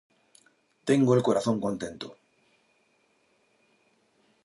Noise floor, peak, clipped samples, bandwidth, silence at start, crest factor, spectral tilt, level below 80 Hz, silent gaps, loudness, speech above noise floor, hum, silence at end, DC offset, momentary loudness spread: -69 dBFS; -10 dBFS; under 0.1%; 11.5 kHz; 0.85 s; 22 dB; -6.5 dB/octave; -68 dBFS; none; -26 LUFS; 43 dB; none; 2.35 s; under 0.1%; 18 LU